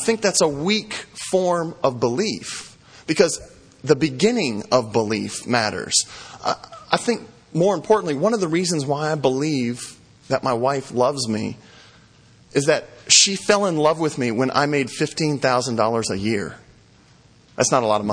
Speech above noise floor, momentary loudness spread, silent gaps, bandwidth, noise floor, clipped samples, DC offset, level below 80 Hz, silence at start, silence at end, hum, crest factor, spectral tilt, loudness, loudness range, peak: 32 dB; 11 LU; none; 10.5 kHz; -52 dBFS; under 0.1%; under 0.1%; -58 dBFS; 0 s; 0 s; none; 22 dB; -3.5 dB/octave; -20 LUFS; 5 LU; 0 dBFS